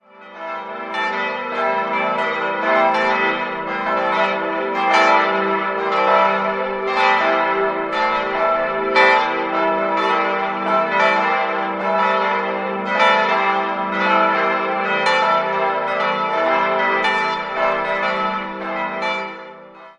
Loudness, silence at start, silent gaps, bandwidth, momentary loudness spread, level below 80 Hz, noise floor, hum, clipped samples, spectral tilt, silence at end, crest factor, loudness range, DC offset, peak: -18 LUFS; 0.15 s; none; 10 kHz; 8 LU; -60 dBFS; -39 dBFS; none; under 0.1%; -4.5 dB/octave; 0.1 s; 18 dB; 2 LU; under 0.1%; 0 dBFS